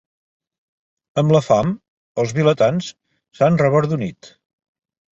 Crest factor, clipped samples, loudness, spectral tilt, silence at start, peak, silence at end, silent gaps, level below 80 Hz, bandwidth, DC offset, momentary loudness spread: 18 dB; under 0.1%; -18 LUFS; -7 dB/octave; 1.15 s; -2 dBFS; 0.85 s; 1.88-2.15 s; -54 dBFS; 8 kHz; under 0.1%; 14 LU